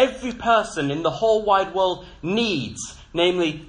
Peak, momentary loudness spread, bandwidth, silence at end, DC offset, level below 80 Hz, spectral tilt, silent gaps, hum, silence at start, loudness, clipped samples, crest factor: -4 dBFS; 10 LU; 10.5 kHz; 0 s; under 0.1%; -48 dBFS; -4.5 dB/octave; none; none; 0 s; -22 LUFS; under 0.1%; 18 dB